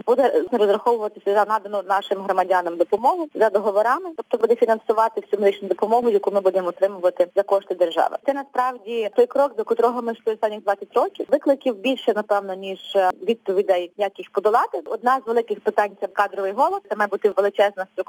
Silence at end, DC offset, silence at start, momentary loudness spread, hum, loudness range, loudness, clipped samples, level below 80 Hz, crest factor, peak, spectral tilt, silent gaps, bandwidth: 0.05 s; under 0.1%; 0.05 s; 5 LU; none; 2 LU; -21 LUFS; under 0.1%; -76 dBFS; 16 dB; -6 dBFS; -5 dB/octave; none; 18.5 kHz